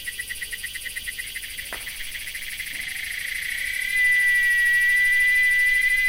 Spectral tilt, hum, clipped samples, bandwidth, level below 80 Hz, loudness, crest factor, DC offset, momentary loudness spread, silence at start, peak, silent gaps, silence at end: 1.5 dB/octave; none; under 0.1%; 17 kHz; -48 dBFS; -21 LUFS; 12 dB; under 0.1%; 14 LU; 0 s; -12 dBFS; none; 0 s